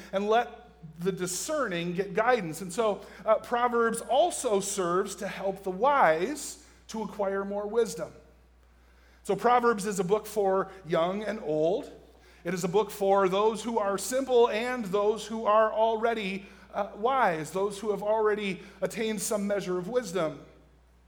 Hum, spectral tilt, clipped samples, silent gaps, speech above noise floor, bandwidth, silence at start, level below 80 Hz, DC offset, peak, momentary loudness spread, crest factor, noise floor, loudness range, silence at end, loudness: none; -4.5 dB/octave; under 0.1%; none; 31 dB; over 20 kHz; 0 s; -60 dBFS; under 0.1%; -8 dBFS; 11 LU; 20 dB; -58 dBFS; 3 LU; 0.6 s; -28 LUFS